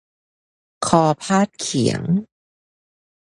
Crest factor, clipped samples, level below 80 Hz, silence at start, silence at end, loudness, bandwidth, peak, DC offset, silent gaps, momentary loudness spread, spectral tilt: 22 dB; under 0.1%; -54 dBFS; 0.8 s; 1.1 s; -19 LUFS; 11.5 kHz; 0 dBFS; under 0.1%; none; 6 LU; -5 dB/octave